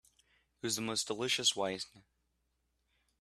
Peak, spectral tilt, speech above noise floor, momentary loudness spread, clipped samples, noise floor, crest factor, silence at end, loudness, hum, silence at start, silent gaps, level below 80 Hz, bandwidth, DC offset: -16 dBFS; -1.5 dB/octave; 45 dB; 13 LU; under 0.1%; -80 dBFS; 22 dB; 1.2 s; -34 LUFS; none; 0.65 s; none; -74 dBFS; 14.5 kHz; under 0.1%